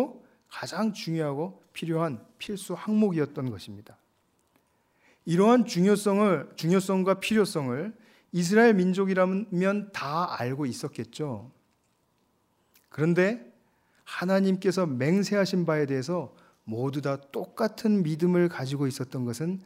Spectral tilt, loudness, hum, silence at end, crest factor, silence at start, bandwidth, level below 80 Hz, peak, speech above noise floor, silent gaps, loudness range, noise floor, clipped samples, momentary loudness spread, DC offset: -6.5 dB/octave; -27 LUFS; none; 0.05 s; 20 dB; 0 s; 16 kHz; -72 dBFS; -8 dBFS; 44 dB; none; 7 LU; -70 dBFS; under 0.1%; 14 LU; under 0.1%